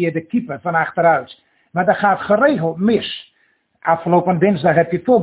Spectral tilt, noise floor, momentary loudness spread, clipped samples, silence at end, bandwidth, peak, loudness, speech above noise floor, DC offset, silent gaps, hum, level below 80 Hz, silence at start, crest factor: -10.5 dB/octave; -61 dBFS; 8 LU; under 0.1%; 0 s; 4 kHz; 0 dBFS; -17 LUFS; 45 dB; under 0.1%; none; none; -56 dBFS; 0 s; 16 dB